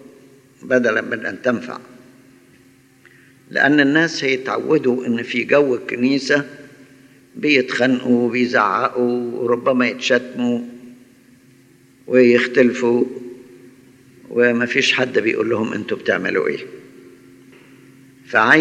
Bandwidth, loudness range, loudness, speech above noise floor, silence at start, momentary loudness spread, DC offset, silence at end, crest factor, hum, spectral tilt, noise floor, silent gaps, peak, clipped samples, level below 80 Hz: 10 kHz; 4 LU; -17 LUFS; 34 dB; 0.65 s; 11 LU; under 0.1%; 0 s; 18 dB; none; -5 dB/octave; -51 dBFS; none; 0 dBFS; under 0.1%; -70 dBFS